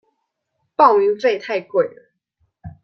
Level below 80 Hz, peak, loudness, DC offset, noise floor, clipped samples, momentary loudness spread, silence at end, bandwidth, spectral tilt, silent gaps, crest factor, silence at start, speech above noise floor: -60 dBFS; -2 dBFS; -17 LUFS; under 0.1%; -74 dBFS; under 0.1%; 11 LU; 0.15 s; 6.6 kHz; -6 dB/octave; none; 18 dB; 0.8 s; 57 dB